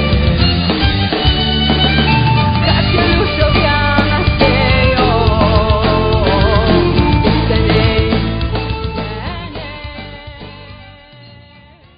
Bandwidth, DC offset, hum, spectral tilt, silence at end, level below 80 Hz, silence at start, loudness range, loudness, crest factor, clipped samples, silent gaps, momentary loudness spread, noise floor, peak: 5.2 kHz; under 0.1%; none; -9.5 dB/octave; 0.7 s; -20 dBFS; 0 s; 9 LU; -13 LUFS; 12 dB; under 0.1%; none; 15 LU; -42 dBFS; 0 dBFS